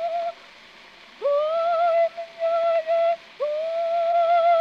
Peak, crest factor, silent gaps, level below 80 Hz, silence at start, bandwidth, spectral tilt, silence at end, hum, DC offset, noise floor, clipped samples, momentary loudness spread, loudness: -12 dBFS; 12 dB; none; -76 dBFS; 0 s; 6.6 kHz; -2 dB/octave; 0 s; none; under 0.1%; -48 dBFS; under 0.1%; 9 LU; -23 LUFS